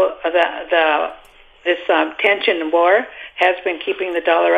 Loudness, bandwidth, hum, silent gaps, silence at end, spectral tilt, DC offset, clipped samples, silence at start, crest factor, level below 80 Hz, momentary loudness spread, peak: -17 LUFS; 8.6 kHz; none; none; 0 s; -3.5 dB/octave; under 0.1%; under 0.1%; 0 s; 16 dB; -56 dBFS; 7 LU; -2 dBFS